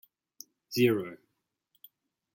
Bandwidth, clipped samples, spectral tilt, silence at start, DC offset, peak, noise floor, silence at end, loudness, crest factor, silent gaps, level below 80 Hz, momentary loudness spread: 17 kHz; under 0.1%; -5.5 dB/octave; 0.7 s; under 0.1%; -12 dBFS; -80 dBFS; 1.2 s; -28 LUFS; 22 dB; none; -76 dBFS; 25 LU